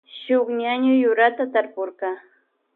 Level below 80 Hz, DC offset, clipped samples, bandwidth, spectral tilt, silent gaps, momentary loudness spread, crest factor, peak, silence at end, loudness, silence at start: -82 dBFS; under 0.1%; under 0.1%; 4.2 kHz; -8 dB/octave; none; 12 LU; 18 dB; -4 dBFS; 0.55 s; -21 LUFS; 0.15 s